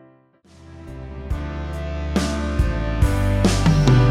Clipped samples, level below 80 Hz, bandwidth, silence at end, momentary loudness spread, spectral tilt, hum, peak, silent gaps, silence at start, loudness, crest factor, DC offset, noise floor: under 0.1%; -26 dBFS; 14.5 kHz; 0 s; 19 LU; -6.5 dB/octave; none; -4 dBFS; none; 0.6 s; -21 LUFS; 16 dB; under 0.1%; -52 dBFS